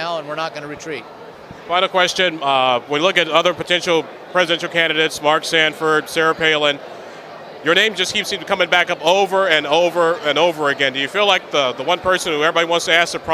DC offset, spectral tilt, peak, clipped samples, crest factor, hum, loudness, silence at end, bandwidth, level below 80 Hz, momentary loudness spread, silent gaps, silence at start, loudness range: under 0.1%; -2.5 dB/octave; 0 dBFS; under 0.1%; 18 dB; none; -16 LUFS; 0 s; 15 kHz; -58 dBFS; 12 LU; none; 0 s; 2 LU